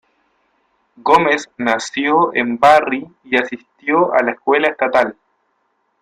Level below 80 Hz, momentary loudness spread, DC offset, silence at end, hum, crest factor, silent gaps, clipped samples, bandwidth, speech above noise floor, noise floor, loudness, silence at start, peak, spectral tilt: -56 dBFS; 11 LU; under 0.1%; 0.9 s; none; 16 dB; none; under 0.1%; 13.5 kHz; 50 dB; -66 dBFS; -15 LUFS; 1.05 s; 0 dBFS; -4 dB/octave